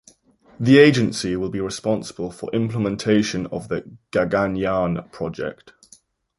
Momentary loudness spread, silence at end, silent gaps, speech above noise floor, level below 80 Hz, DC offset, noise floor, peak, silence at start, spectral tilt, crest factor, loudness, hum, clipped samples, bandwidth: 15 LU; 0.7 s; none; 34 dB; -50 dBFS; under 0.1%; -54 dBFS; 0 dBFS; 0.6 s; -6 dB/octave; 20 dB; -21 LUFS; none; under 0.1%; 11.5 kHz